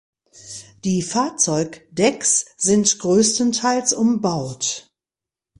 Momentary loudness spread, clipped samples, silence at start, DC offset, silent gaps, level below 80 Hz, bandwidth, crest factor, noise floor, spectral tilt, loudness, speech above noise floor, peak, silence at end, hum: 12 LU; under 0.1%; 0.45 s; under 0.1%; none; -58 dBFS; 11.5 kHz; 18 dB; -89 dBFS; -3.5 dB/octave; -19 LUFS; 70 dB; -4 dBFS; 0.8 s; none